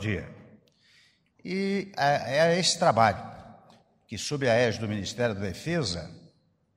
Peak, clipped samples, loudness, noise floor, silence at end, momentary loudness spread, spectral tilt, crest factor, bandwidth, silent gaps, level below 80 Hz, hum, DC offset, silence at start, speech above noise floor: -6 dBFS; under 0.1%; -27 LUFS; -64 dBFS; 0.6 s; 17 LU; -4.5 dB/octave; 22 dB; 15.5 kHz; none; -58 dBFS; none; under 0.1%; 0 s; 38 dB